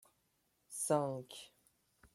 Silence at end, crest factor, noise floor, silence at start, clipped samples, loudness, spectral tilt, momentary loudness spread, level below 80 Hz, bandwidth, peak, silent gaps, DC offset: 0.1 s; 22 dB; -79 dBFS; 0.7 s; under 0.1%; -38 LUFS; -4.5 dB/octave; 18 LU; -80 dBFS; 16 kHz; -20 dBFS; none; under 0.1%